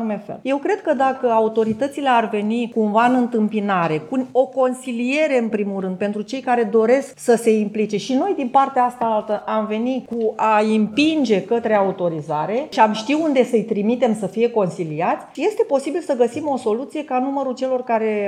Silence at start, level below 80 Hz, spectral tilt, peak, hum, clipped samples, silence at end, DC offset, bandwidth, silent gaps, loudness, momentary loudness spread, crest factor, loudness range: 0 s; -68 dBFS; -6 dB/octave; -2 dBFS; none; under 0.1%; 0 s; under 0.1%; 13.5 kHz; none; -19 LUFS; 6 LU; 16 dB; 2 LU